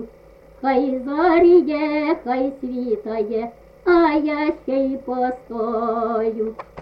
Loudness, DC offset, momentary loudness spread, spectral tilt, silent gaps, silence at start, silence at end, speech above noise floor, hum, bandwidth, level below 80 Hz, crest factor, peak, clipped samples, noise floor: -20 LUFS; under 0.1%; 11 LU; -7.5 dB/octave; none; 0 s; 0 s; 27 dB; none; 5.4 kHz; -50 dBFS; 16 dB; -4 dBFS; under 0.1%; -47 dBFS